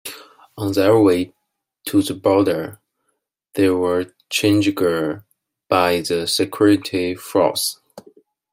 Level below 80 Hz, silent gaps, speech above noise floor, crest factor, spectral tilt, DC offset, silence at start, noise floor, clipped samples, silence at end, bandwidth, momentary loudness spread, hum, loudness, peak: -60 dBFS; none; 55 dB; 18 dB; -5 dB/octave; under 0.1%; 0.05 s; -72 dBFS; under 0.1%; 0.5 s; 16 kHz; 14 LU; none; -18 LUFS; -2 dBFS